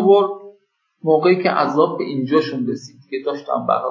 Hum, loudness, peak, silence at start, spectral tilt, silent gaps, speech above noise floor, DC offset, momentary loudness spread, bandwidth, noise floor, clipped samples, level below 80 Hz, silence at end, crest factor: none; -19 LUFS; -2 dBFS; 0 s; -7 dB/octave; none; 42 dB; under 0.1%; 11 LU; 7.4 kHz; -59 dBFS; under 0.1%; -74 dBFS; 0 s; 16 dB